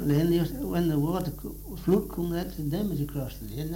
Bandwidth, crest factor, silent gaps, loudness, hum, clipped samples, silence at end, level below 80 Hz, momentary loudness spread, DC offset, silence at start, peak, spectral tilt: 17 kHz; 16 dB; none; -29 LUFS; none; under 0.1%; 0 s; -42 dBFS; 11 LU; under 0.1%; 0 s; -12 dBFS; -7.5 dB/octave